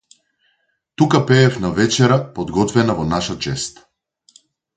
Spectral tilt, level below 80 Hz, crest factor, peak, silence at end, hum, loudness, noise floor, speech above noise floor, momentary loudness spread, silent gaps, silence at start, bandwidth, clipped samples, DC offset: -5.5 dB/octave; -44 dBFS; 18 dB; 0 dBFS; 1.05 s; none; -17 LUFS; -67 dBFS; 50 dB; 9 LU; none; 1 s; 9.4 kHz; under 0.1%; under 0.1%